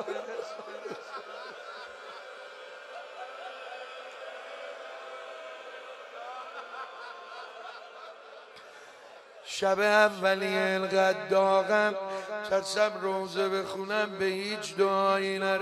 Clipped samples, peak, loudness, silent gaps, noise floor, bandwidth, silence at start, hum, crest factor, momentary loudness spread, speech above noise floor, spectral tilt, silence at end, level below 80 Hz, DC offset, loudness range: under 0.1%; -10 dBFS; -28 LUFS; none; -51 dBFS; 13.5 kHz; 0 s; none; 20 dB; 20 LU; 24 dB; -3.5 dB/octave; 0 s; -80 dBFS; under 0.1%; 17 LU